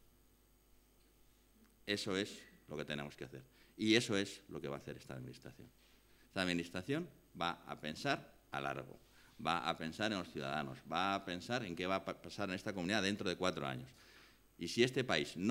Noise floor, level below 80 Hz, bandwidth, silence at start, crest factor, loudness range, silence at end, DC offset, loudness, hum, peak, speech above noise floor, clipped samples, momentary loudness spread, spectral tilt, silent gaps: -70 dBFS; -72 dBFS; 16 kHz; 1.85 s; 26 dB; 5 LU; 0 s; under 0.1%; -40 LUFS; none; -16 dBFS; 30 dB; under 0.1%; 16 LU; -4.5 dB/octave; none